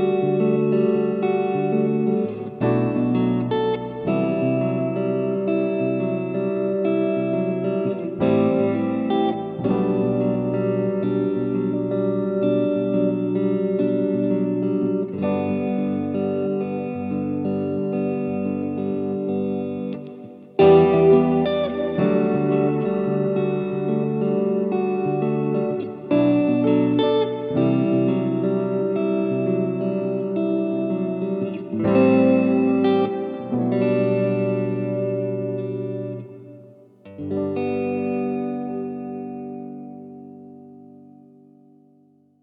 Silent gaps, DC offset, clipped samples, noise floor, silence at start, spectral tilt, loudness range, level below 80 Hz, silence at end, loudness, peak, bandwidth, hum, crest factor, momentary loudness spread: none; under 0.1%; under 0.1%; -57 dBFS; 0 s; -11.5 dB/octave; 8 LU; -60 dBFS; 1.4 s; -22 LUFS; -4 dBFS; 4.7 kHz; none; 18 dB; 9 LU